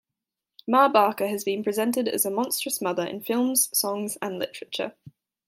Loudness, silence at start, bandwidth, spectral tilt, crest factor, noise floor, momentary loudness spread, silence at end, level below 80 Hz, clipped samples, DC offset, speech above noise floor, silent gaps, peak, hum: -25 LUFS; 0.65 s; 16.5 kHz; -2.5 dB/octave; 20 dB; -87 dBFS; 12 LU; 0.4 s; -78 dBFS; under 0.1%; under 0.1%; 62 dB; none; -6 dBFS; none